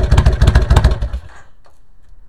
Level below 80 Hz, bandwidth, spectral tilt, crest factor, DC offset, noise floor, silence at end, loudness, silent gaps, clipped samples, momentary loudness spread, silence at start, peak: -16 dBFS; 11.5 kHz; -6.5 dB/octave; 14 dB; 2%; -46 dBFS; 1 s; -14 LUFS; none; 0.5%; 14 LU; 0 s; 0 dBFS